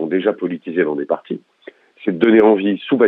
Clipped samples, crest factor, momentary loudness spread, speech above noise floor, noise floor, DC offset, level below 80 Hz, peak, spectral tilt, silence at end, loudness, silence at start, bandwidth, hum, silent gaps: under 0.1%; 16 dB; 13 LU; 28 dB; -43 dBFS; under 0.1%; -62 dBFS; 0 dBFS; -9 dB/octave; 0 s; -17 LUFS; 0 s; 4.1 kHz; none; none